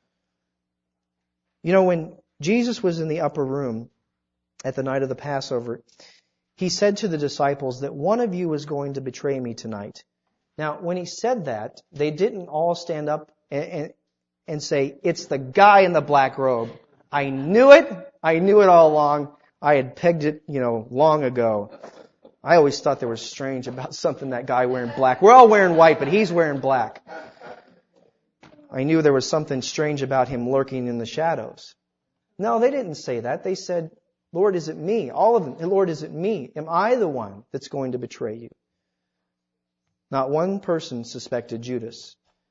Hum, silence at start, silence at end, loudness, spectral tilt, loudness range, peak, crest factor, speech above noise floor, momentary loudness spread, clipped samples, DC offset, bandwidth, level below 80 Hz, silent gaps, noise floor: none; 1.65 s; 0.45 s; -21 LUFS; -5.5 dB/octave; 12 LU; 0 dBFS; 22 dB; 61 dB; 17 LU; under 0.1%; under 0.1%; 7.8 kHz; -64 dBFS; none; -81 dBFS